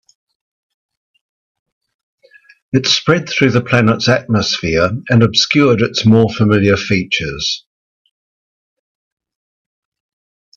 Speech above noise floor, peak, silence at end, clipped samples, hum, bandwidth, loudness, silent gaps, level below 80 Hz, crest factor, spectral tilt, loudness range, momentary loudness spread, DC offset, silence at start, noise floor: over 77 dB; 0 dBFS; 2.95 s; under 0.1%; none; 7.4 kHz; -13 LUFS; none; -46 dBFS; 16 dB; -5 dB/octave; 9 LU; 7 LU; under 0.1%; 2.75 s; under -90 dBFS